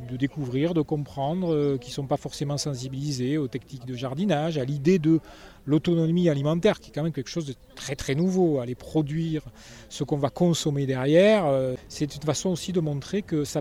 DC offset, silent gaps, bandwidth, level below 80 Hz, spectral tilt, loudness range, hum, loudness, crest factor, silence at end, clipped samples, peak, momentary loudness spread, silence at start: under 0.1%; none; 15 kHz; -52 dBFS; -6.5 dB/octave; 4 LU; none; -26 LUFS; 18 dB; 0 s; under 0.1%; -8 dBFS; 10 LU; 0 s